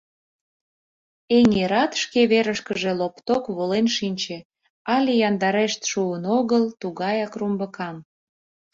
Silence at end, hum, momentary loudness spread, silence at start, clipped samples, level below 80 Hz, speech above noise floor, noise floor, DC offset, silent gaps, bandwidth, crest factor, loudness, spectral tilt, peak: 0.7 s; none; 11 LU; 1.3 s; under 0.1%; -60 dBFS; over 68 dB; under -90 dBFS; under 0.1%; 4.45-4.50 s, 4.70-4.85 s; 7.6 kHz; 16 dB; -22 LUFS; -4.5 dB/octave; -6 dBFS